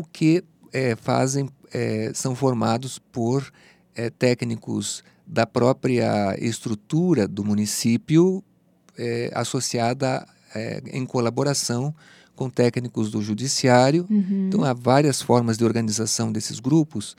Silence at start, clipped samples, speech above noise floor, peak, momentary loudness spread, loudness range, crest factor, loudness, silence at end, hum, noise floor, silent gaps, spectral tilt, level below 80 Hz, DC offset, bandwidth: 0 s; under 0.1%; 36 dB; -2 dBFS; 12 LU; 5 LU; 22 dB; -23 LUFS; 0.05 s; none; -58 dBFS; none; -5.5 dB/octave; -66 dBFS; under 0.1%; 16 kHz